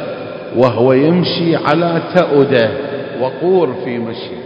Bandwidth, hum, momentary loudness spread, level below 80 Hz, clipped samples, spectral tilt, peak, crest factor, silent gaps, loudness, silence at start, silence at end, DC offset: 7.4 kHz; none; 11 LU; -54 dBFS; 0.2%; -8.5 dB/octave; 0 dBFS; 14 dB; none; -14 LUFS; 0 s; 0 s; under 0.1%